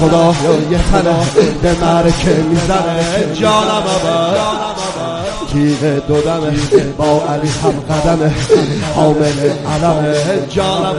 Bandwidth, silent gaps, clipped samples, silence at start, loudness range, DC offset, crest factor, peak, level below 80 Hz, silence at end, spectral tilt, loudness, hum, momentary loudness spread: 11.5 kHz; none; under 0.1%; 0 s; 2 LU; under 0.1%; 12 dB; 0 dBFS; -28 dBFS; 0 s; -5.5 dB/octave; -13 LUFS; none; 4 LU